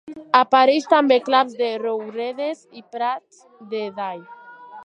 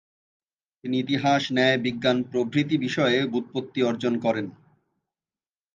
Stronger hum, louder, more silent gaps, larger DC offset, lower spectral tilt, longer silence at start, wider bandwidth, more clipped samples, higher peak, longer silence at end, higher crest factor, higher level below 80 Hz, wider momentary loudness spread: neither; first, -20 LUFS vs -24 LUFS; neither; neither; second, -4 dB/octave vs -5.5 dB/octave; second, 0.05 s vs 0.85 s; first, 9.2 kHz vs 7.6 kHz; neither; first, -2 dBFS vs -6 dBFS; second, 0 s vs 1.25 s; about the same, 20 dB vs 20 dB; second, -78 dBFS vs -70 dBFS; first, 16 LU vs 8 LU